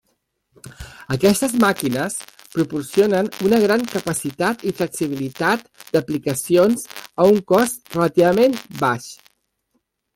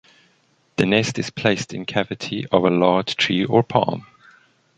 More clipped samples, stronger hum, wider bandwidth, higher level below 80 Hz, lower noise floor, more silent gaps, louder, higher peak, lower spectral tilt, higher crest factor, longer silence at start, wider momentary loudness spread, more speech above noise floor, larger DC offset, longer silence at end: neither; neither; first, 17 kHz vs 10.5 kHz; about the same, -54 dBFS vs -56 dBFS; first, -70 dBFS vs -62 dBFS; neither; about the same, -19 LUFS vs -20 LUFS; about the same, -2 dBFS vs -2 dBFS; about the same, -5 dB/octave vs -5.5 dB/octave; about the same, 16 dB vs 20 dB; second, 0.65 s vs 0.8 s; about the same, 11 LU vs 9 LU; first, 52 dB vs 42 dB; neither; first, 1 s vs 0.75 s